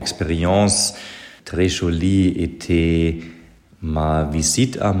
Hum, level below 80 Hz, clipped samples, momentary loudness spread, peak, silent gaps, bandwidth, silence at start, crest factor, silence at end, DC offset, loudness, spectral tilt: none; -32 dBFS; under 0.1%; 16 LU; -4 dBFS; none; 15.5 kHz; 0 s; 14 dB; 0 s; under 0.1%; -19 LUFS; -4.5 dB/octave